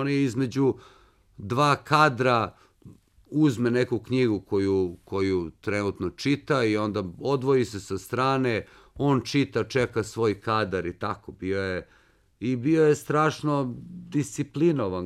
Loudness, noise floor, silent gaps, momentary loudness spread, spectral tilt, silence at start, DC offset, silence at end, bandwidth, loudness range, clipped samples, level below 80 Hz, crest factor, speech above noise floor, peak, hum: -26 LUFS; -52 dBFS; none; 10 LU; -6.5 dB/octave; 0 s; under 0.1%; 0 s; 14 kHz; 2 LU; under 0.1%; -58 dBFS; 20 dB; 27 dB; -6 dBFS; none